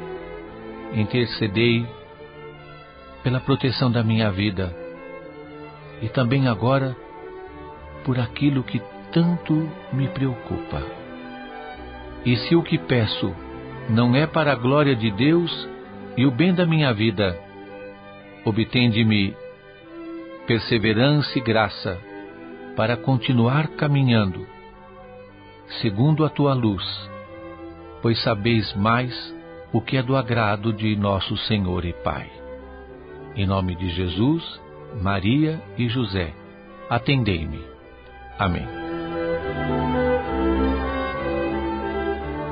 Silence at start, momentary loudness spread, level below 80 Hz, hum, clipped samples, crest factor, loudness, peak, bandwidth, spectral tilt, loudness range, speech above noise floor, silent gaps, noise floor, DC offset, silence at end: 0 s; 20 LU; -40 dBFS; none; under 0.1%; 18 dB; -22 LUFS; -4 dBFS; 5.2 kHz; -11.5 dB/octave; 5 LU; 23 dB; none; -44 dBFS; under 0.1%; 0 s